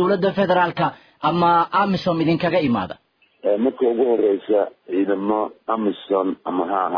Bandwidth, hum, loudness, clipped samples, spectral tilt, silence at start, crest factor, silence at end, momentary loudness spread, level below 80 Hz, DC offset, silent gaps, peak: 5.4 kHz; none; -20 LUFS; under 0.1%; -8.5 dB/octave; 0 s; 14 dB; 0 s; 7 LU; -58 dBFS; under 0.1%; none; -6 dBFS